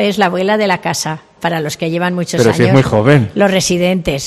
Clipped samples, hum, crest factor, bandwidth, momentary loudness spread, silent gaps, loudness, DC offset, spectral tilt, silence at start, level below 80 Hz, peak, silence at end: 0.2%; none; 12 dB; 15 kHz; 8 LU; none; -13 LUFS; under 0.1%; -5 dB/octave; 0 s; -40 dBFS; 0 dBFS; 0 s